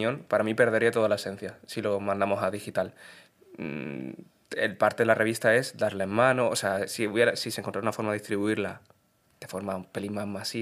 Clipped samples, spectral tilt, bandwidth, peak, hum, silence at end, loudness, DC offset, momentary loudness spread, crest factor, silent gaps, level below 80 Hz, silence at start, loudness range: under 0.1%; -4.5 dB/octave; 16 kHz; -6 dBFS; none; 0 s; -27 LUFS; under 0.1%; 14 LU; 22 dB; none; -72 dBFS; 0 s; 7 LU